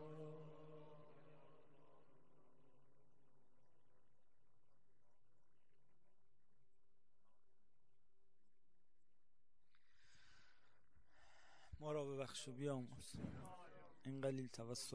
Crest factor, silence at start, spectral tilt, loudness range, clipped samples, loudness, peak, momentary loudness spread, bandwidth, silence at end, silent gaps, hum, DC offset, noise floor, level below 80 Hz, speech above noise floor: 22 dB; 0 s; -5 dB/octave; 15 LU; under 0.1%; -51 LUFS; -34 dBFS; 20 LU; 11 kHz; 0 s; none; none; 0.1%; -90 dBFS; -78 dBFS; 40 dB